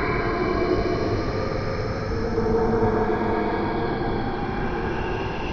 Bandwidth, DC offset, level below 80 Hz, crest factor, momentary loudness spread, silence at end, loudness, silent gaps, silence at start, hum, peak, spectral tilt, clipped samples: 6.8 kHz; under 0.1%; -34 dBFS; 14 dB; 5 LU; 0 s; -25 LUFS; none; 0 s; none; -8 dBFS; -7.5 dB/octave; under 0.1%